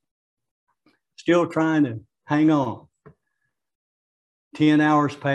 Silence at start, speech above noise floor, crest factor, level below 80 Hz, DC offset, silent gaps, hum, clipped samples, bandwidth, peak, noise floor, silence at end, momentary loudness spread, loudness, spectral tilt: 1.2 s; 58 dB; 18 dB; -70 dBFS; under 0.1%; 3.75-4.51 s; none; under 0.1%; 8.4 kHz; -6 dBFS; -78 dBFS; 0 s; 12 LU; -21 LUFS; -7 dB/octave